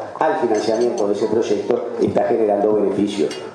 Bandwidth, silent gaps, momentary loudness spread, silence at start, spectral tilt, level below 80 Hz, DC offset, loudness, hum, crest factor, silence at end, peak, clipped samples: 11 kHz; none; 3 LU; 0 s; -5.5 dB/octave; -64 dBFS; under 0.1%; -19 LUFS; none; 16 dB; 0 s; -2 dBFS; under 0.1%